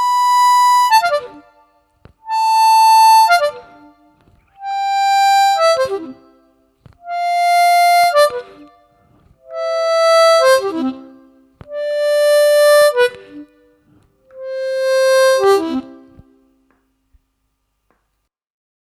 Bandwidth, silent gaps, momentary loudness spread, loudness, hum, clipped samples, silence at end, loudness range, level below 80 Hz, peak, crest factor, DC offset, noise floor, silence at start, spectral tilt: 17.5 kHz; none; 15 LU; -13 LUFS; none; under 0.1%; 3 s; 5 LU; -60 dBFS; 0 dBFS; 16 dB; under 0.1%; -70 dBFS; 0 s; -1 dB/octave